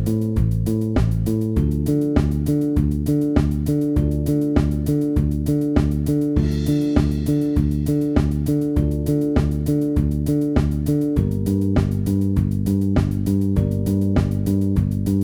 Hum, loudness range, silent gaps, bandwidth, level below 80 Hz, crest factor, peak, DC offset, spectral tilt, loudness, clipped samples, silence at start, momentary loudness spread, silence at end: none; 0 LU; none; over 20 kHz; -28 dBFS; 16 dB; -4 dBFS; under 0.1%; -8.5 dB/octave; -20 LUFS; under 0.1%; 0 s; 2 LU; 0 s